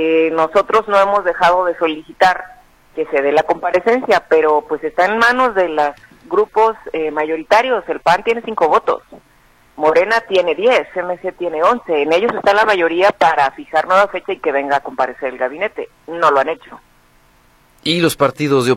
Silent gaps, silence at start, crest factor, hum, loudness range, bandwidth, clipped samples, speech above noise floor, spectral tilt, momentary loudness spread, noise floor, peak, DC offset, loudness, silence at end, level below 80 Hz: none; 0 s; 14 dB; none; 4 LU; 15.5 kHz; under 0.1%; 36 dB; -4.5 dB/octave; 9 LU; -51 dBFS; 0 dBFS; under 0.1%; -15 LUFS; 0 s; -52 dBFS